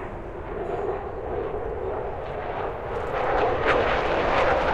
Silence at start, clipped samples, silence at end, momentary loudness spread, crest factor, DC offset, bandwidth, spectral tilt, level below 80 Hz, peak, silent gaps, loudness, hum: 0 s; under 0.1%; 0 s; 10 LU; 18 dB; under 0.1%; 9.6 kHz; -6 dB/octave; -38 dBFS; -6 dBFS; none; -26 LUFS; none